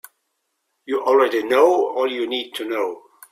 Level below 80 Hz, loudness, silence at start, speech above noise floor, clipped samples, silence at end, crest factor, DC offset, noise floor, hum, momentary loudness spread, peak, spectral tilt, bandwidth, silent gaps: -70 dBFS; -20 LUFS; 0.9 s; 55 dB; under 0.1%; 0.3 s; 18 dB; under 0.1%; -74 dBFS; none; 11 LU; -2 dBFS; -3 dB/octave; 16 kHz; none